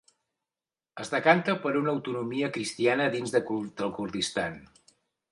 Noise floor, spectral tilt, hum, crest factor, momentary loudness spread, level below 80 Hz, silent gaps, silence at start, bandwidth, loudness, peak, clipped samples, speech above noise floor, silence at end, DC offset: under -90 dBFS; -4.5 dB/octave; none; 22 dB; 11 LU; -66 dBFS; none; 0.95 s; 11.5 kHz; -28 LUFS; -6 dBFS; under 0.1%; over 62 dB; 0.65 s; under 0.1%